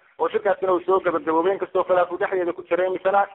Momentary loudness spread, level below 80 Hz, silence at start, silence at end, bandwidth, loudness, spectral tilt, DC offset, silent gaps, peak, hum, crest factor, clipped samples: 4 LU; -64 dBFS; 0.2 s; 0.05 s; 4 kHz; -22 LUFS; -7.5 dB/octave; under 0.1%; none; -6 dBFS; none; 14 dB; under 0.1%